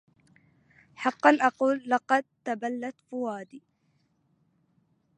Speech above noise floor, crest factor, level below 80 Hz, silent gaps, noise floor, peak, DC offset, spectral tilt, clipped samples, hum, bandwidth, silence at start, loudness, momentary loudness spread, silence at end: 44 dB; 26 dB; -82 dBFS; none; -71 dBFS; -4 dBFS; under 0.1%; -4.5 dB/octave; under 0.1%; none; 10 kHz; 1 s; -27 LUFS; 15 LU; 1.6 s